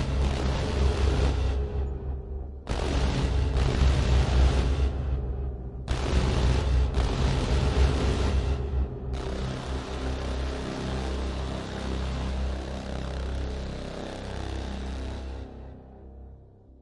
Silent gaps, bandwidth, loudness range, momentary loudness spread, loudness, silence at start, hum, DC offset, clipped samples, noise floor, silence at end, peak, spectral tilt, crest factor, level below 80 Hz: none; 11 kHz; 8 LU; 12 LU; -29 LUFS; 0 s; none; under 0.1%; under 0.1%; -50 dBFS; 0.35 s; -12 dBFS; -6.5 dB/octave; 16 dB; -28 dBFS